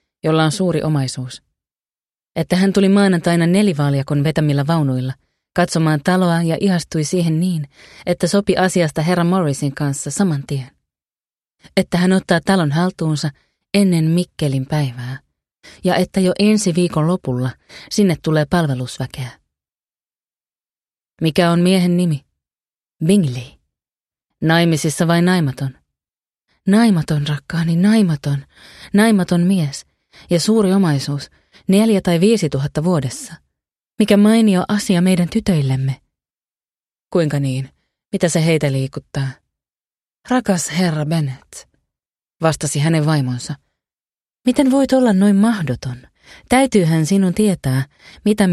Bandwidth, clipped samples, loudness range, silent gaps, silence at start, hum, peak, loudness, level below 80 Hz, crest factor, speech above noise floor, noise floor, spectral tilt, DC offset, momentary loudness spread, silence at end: 13.5 kHz; under 0.1%; 5 LU; none; 0.25 s; none; 0 dBFS; -17 LUFS; -48 dBFS; 16 dB; over 74 dB; under -90 dBFS; -6 dB/octave; under 0.1%; 12 LU; 0 s